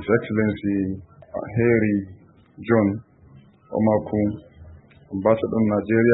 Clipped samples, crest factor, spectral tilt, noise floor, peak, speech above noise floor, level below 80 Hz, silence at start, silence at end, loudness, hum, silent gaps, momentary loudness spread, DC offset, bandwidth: under 0.1%; 18 dB; -13 dB/octave; -50 dBFS; -4 dBFS; 29 dB; -52 dBFS; 0 s; 0 s; -22 LUFS; none; none; 15 LU; under 0.1%; 4 kHz